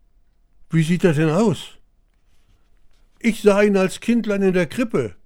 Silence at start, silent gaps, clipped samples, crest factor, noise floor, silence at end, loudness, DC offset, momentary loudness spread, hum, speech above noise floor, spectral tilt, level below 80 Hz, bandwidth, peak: 0.7 s; none; under 0.1%; 20 dB; -57 dBFS; 0.1 s; -19 LUFS; under 0.1%; 7 LU; none; 39 dB; -6.5 dB/octave; -48 dBFS; 16.5 kHz; -2 dBFS